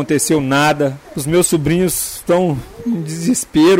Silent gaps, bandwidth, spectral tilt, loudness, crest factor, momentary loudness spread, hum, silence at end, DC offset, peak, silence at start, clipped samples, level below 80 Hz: none; 16.5 kHz; -4.5 dB/octave; -16 LUFS; 10 dB; 8 LU; none; 0 s; under 0.1%; -4 dBFS; 0 s; under 0.1%; -42 dBFS